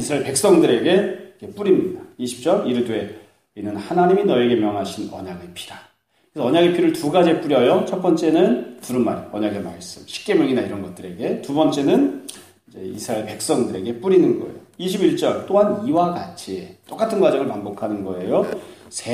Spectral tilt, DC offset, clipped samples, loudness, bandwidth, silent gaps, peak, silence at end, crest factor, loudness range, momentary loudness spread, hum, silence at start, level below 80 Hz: -5.5 dB/octave; under 0.1%; under 0.1%; -19 LUFS; 15.5 kHz; none; -4 dBFS; 0 s; 16 dB; 4 LU; 17 LU; none; 0 s; -60 dBFS